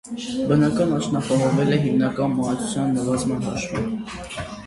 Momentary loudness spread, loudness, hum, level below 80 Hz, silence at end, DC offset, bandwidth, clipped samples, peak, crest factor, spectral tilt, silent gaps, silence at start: 10 LU; -22 LUFS; none; -48 dBFS; 0 s; under 0.1%; 11.5 kHz; under 0.1%; -6 dBFS; 16 dB; -6 dB/octave; none; 0.05 s